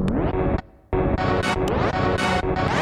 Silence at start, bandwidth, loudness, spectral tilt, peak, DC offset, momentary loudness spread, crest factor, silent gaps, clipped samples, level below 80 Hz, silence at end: 0 s; 14.5 kHz; -23 LUFS; -6.5 dB/octave; -8 dBFS; under 0.1%; 4 LU; 14 dB; none; under 0.1%; -32 dBFS; 0 s